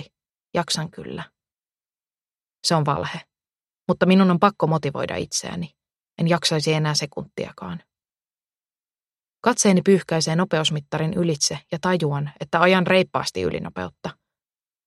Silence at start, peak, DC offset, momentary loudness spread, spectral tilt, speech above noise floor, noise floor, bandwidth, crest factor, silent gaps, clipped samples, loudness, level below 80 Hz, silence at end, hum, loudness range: 0 s; -2 dBFS; under 0.1%; 17 LU; -4.5 dB/octave; over 69 dB; under -90 dBFS; 13 kHz; 22 dB; 9.07-9.11 s; under 0.1%; -21 LUFS; -58 dBFS; 0.75 s; none; 6 LU